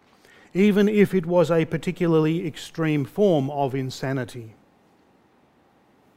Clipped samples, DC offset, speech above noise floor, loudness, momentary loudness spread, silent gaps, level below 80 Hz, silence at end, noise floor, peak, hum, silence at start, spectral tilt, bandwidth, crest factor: under 0.1%; under 0.1%; 38 dB; -22 LUFS; 11 LU; none; -56 dBFS; 1.65 s; -60 dBFS; -4 dBFS; none; 0.55 s; -7.5 dB/octave; 16 kHz; 18 dB